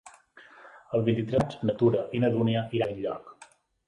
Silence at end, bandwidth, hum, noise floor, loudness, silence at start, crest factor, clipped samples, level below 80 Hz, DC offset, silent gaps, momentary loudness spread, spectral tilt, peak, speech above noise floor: 0.45 s; 11 kHz; none; -56 dBFS; -27 LUFS; 0.05 s; 18 dB; under 0.1%; -58 dBFS; under 0.1%; none; 8 LU; -8 dB/octave; -10 dBFS; 30 dB